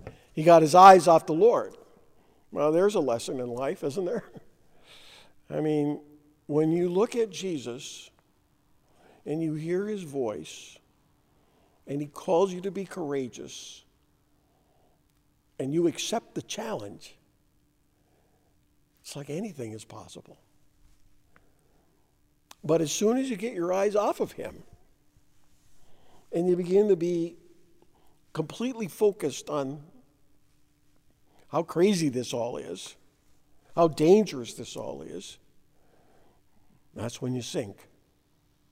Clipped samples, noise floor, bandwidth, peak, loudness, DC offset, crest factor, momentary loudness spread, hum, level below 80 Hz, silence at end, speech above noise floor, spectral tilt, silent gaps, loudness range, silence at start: under 0.1%; -67 dBFS; 16 kHz; -2 dBFS; -26 LUFS; under 0.1%; 26 dB; 19 LU; none; -68 dBFS; 1 s; 42 dB; -5.5 dB/octave; none; 13 LU; 0.05 s